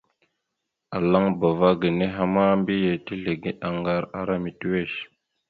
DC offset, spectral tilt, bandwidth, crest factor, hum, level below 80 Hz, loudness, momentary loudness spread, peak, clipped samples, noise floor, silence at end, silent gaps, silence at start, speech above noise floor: under 0.1%; -9.5 dB/octave; 4.7 kHz; 18 dB; none; -54 dBFS; -24 LUFS; 9 LU; -6 dBFS; under 0.1%; -81 dBFS; 0.45 s; none; 0.9 s; 58 dB